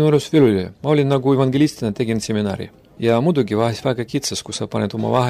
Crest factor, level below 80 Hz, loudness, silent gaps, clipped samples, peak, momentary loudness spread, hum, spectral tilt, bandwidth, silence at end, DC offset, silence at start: 14 dB; -52 dBFS; -19 LUFS; none; under 0.1%; -4 dBFS; 9 LU; none; -6 dB/octave; 15 kHz; 0 s; under 0.1%; 0 s